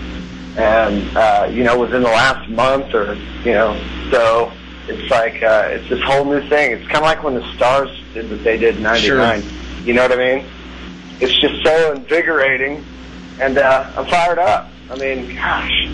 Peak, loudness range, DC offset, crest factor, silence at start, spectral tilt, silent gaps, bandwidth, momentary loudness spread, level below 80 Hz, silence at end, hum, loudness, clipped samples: -2 dBFS; 2 LU; under 0.1%; 14 dB; 0 s; -4.5 dB/octave; none; 11 kHz; 15 LU; -34 dBFS; 0 s; none; -15 LUFS; under 0.1%